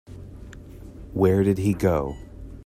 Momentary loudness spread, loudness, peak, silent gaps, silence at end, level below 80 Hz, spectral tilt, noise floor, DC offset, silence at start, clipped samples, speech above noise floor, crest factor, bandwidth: 23 LU; -23 LUFS; -6 dBFS; none; 0 s; -42 dBFS; -8.5 dB/octave; -41 dBFS; under 0.1%; 0.1 s; under 0.1%; 20 dB; 18 dB; 15.5 kHz